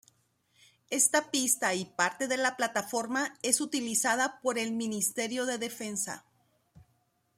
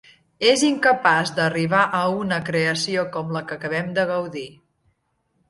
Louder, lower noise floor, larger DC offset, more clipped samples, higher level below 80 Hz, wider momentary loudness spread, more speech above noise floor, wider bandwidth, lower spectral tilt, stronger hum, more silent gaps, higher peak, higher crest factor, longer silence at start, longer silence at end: second, -29 LUFS vs -21 LUFS; about the same, -73 dBFS vs -70 dBFS; neither; neither; second, -78 dBFS vs -62 dBFS; about the same, 8 LU vs 10 LU; second, 42 dB vs 49 dB; first, 16 kHz vs 11.5 kHz; second, -1.5 dB/octave vs -4 dB/octave; neither; neither; second, -10 dBFS vs -2 dBFS; about the same, 22 dB vs 20 dB; first, 0.9 s vs 0.4 s; first, 1.2 s vs 1 s